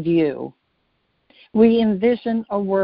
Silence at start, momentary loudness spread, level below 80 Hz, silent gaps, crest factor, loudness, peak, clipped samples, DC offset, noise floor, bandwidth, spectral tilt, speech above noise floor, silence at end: 0 s; 13 LU; -56 dBFS; none; 16 dB; -19 LUFS; -4 dBFS; under 0.1%; under 0.1%; -68 dBFS; 5.2 kHz; -6.5 dB/octave; 50 dB; 0 s